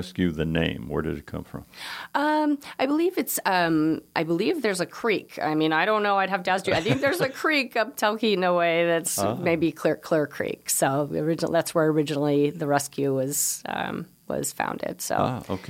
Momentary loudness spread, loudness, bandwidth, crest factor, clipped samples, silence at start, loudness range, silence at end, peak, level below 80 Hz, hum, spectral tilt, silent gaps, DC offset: 8 LU; -25 LUFS; 17 kHz; 18 dB; under 0.1%; 0 s; 3 LU; 0 s; -6 dBFS; -54 dBFS; none; -4 dB/octave; none; under 0.1%